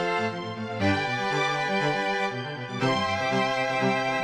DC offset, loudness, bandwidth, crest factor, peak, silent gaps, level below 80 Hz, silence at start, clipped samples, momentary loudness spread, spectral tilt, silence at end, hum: under 0.1%; -26 LUFS; 13 kHz; 16 dB; -12 dBFS; none; -64 dBFS; 0 s; under 0.1%; 6 LU; -5 dB/octave; 0 s; none